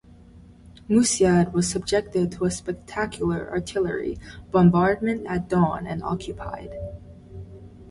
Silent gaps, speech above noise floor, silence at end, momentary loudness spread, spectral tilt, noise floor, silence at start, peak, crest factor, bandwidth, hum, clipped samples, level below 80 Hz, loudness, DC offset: none; 25 dB; 0 s; 19 LU; -5.5 dB/octave; -48 dBFS; 0.35 s; -6 dBFS; 18 dB; 11.5 kHz; none; under 0.1%; -46 dBFS; -23 LUFS; under 0.1%